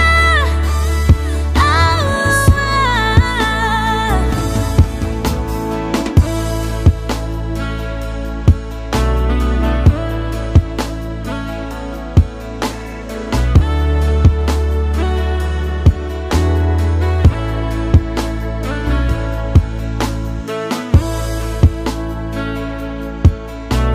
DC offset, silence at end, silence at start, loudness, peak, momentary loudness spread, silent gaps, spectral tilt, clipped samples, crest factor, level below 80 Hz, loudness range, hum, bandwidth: under 0.1%; 0 s; 0 s; -16 LUFS; 0 dBFS; 10 LU; none; -6 dB/octave; under 0.1%; 14 dB; -18 dBFS; 5 LU; none; 15 kHz